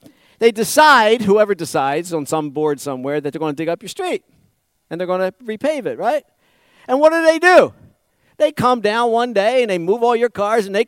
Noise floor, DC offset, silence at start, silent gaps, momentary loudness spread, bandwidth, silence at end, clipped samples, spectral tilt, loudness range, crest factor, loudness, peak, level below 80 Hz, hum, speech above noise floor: -61 dBFS; under 0.1%; 0.4 s; none; 12 LU; 16.5 kHz; 0.05 s; under 0.1%; -4 dB/octave; 8 LU; 16 dB; -16 LUFS; -2 dBFS; -60 dBFS; none; 45 dB